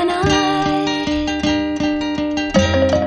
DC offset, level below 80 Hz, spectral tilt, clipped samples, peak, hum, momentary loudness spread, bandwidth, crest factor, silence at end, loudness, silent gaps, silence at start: under 0.1%; -34 dBFS; -5 dB/octave; under 0.1%; -2 dBFS; none; 5 LU; 11 kHz; 16 dB; 0 s; -17 LUFS; none; 0 s